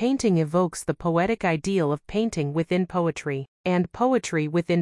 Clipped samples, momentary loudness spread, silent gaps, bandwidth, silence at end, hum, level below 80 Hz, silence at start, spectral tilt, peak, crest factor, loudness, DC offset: under 0.1%; 4 LU; 3.48-3.64 s; 12 kHz; 0 s; none; -54 dBFS; 0 s; -6.5 dB/octave; -10 dBFS; 14 dB; -24 LUFS; under 0.1%